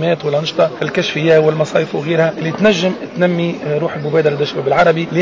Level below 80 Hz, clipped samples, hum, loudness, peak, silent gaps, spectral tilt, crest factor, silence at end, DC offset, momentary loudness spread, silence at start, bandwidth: -54 dBFS; under 0.1%; none; -15 LUFS; -2 dBFS; none; -6 dB/octave; 12 dB; 0 s; 0.1%; 6 LU; 0 s; 7.6 kHz